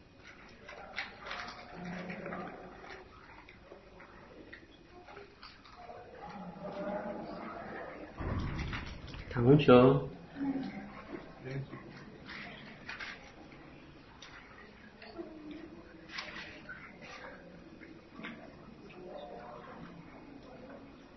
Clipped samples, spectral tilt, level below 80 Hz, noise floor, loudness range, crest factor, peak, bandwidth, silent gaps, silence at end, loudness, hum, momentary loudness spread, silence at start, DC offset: under 0.1%; -6 dB/octave; -56 dBFS; -56 dBFS; 20 LU; 28 dB; -10 dBFS; 6 kHz; none; 0 s; -35 LUFS; none; 16 LU; 0 s; under 0.1%